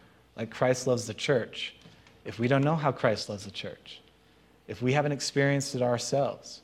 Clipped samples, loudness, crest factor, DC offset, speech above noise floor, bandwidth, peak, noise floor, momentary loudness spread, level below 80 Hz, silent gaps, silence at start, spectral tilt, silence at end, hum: under 0.1%; -29 LUFS; 22 dB; under 0.1%; 32 dB; 13.5 kHz; -8 dBFS; -61 dBFS; 17 LU; -66 dBFS; none; 0.35 s; -5 dB/octave; 0.05 s; none